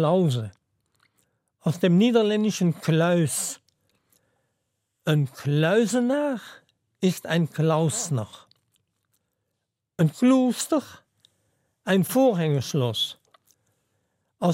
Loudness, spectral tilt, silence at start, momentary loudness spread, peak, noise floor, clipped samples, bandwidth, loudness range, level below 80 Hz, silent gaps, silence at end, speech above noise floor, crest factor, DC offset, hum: -23 LUFS; -5.5 dB/octave; 0 s; 11 LU; -8 dBFS; -81 dBFS; under 0.1%; 16.5 kHz; 3 LU; -72 dBFS; none; 0 s; 58 dB; 16 dB; under 0.1%; none